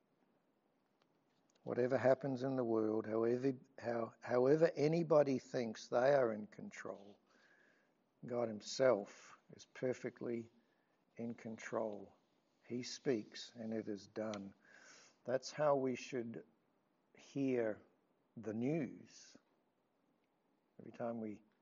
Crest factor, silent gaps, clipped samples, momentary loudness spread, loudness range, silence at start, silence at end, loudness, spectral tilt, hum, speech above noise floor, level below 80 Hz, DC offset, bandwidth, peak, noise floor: 20 dB; none; under 0.1%; 19 LU; 10 LU; 1.65 s; 0.25 s; -39 LUFS; -5.5 dB/octave; none; 42 dB; under -90 dBFS; under 0.1%; 7.4 kHz; -20 dBFS; -80 dBFS